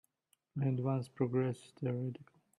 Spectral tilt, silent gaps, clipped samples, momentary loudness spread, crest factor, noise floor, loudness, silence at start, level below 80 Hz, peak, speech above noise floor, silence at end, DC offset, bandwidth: -9 dB/octave; none; under 0.1%; 10 LU; 18 dB; -79 dBFS; -37 LUFS; 0.55 s; -76 dBFS; -20 dBFS; 43 dB; 0.35 s; under 0.1%; 11 kHz